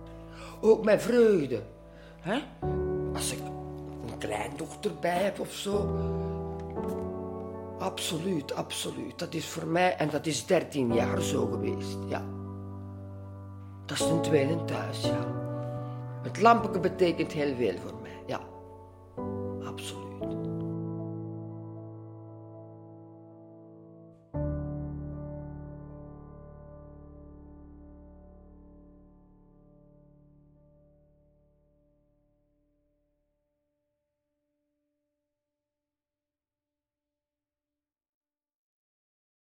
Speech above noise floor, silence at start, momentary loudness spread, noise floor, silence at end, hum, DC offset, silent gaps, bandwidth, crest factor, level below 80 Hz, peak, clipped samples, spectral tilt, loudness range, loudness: over 62 dB; 0 s; 24 LU; under -90 dBFS; 10.5 s; none; under 0.1%; none; 16.5 kHz; 26 dB; -52 dBFS; -6 dBFS; under 0.1%; -5.5 dB/octave; 15 LU; -31 LUFS